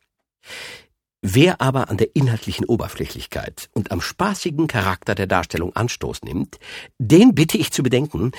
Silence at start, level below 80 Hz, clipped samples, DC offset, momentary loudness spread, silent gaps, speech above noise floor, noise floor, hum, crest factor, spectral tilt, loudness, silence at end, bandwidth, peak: 0.45 s; -44 dBFS; under 0.1%; under 0.1%; 15 LU; none; 33 dB; -52 dBFS; none; 20 dB; -5.5 dB/octave; -20 LUFS; 0 s; 19 kHz; 0 dBFS